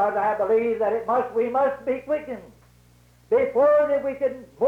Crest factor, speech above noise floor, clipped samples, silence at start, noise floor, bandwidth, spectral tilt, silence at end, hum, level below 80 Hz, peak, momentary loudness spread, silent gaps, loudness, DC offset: 12 dB; 33 dB; under 0.1%; 0 s; -55 dBFS; 7 kHz; -7 dB/octave; 0 s; 60 Hz at -55 dBFS; -60 dBFS; -12 dBFS; 10 LU; none; -23 LUFS; under 0.1%